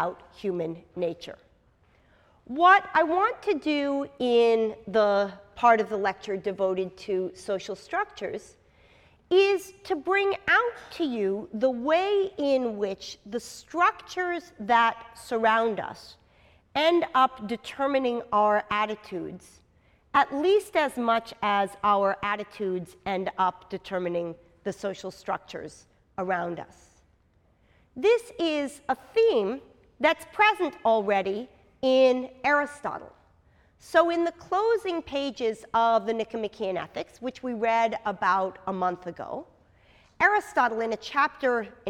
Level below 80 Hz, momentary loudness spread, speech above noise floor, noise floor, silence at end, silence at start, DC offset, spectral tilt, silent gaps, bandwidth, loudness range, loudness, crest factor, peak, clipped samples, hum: -64 dBFS; 14 LU; 38 dB; -64 dBFS; 0 s; 0 s; under 0.1%; -4.5 dB/octave; none; 15 kHz; 6 LU; -26 LUFS; 20 dB; -6 dBFS; under 0.1%; none